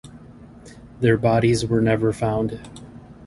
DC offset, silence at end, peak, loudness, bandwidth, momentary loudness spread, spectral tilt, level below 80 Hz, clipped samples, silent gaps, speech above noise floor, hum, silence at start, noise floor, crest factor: under 0.1%; 0 s; -4 dBFS; -20 LUFS; 11.5 kHz; 19 LU; -7 dB/octave; -44 dBFS; under 0.1%; none; 24 dB; none; 0.05 s; -44 dBFS; 18 dB